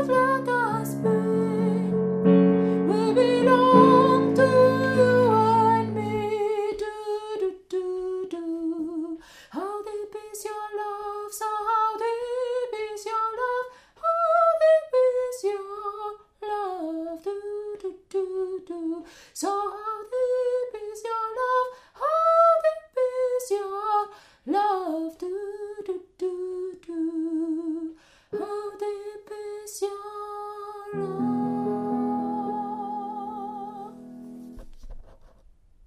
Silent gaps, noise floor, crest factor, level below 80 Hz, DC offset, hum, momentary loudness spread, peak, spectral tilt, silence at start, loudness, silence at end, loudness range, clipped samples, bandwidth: none; -55 dBFS; 22 dB; -58 dBFS; under 0.1%; none; 17 LU; -2 dBFS; -6.5 dB/octave; 0 s; -25 LUFS; 0.6 s; 13 LU; under 0.1%; 15 kHz